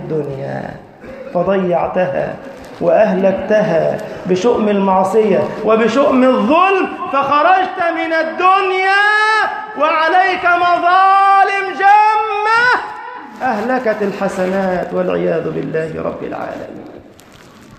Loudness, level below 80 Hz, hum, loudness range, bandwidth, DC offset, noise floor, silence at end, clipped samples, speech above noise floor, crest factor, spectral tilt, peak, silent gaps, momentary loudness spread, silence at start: -14 LUFS; -50 dBFS; none; 7 LU; 13 kHz; under 0.1%; -41 dBFS; 0.05 s; under 0.1%; 27 dB; 14 dB; -6 dB/octave; 0 dBFS; none; 13 LU; 0 s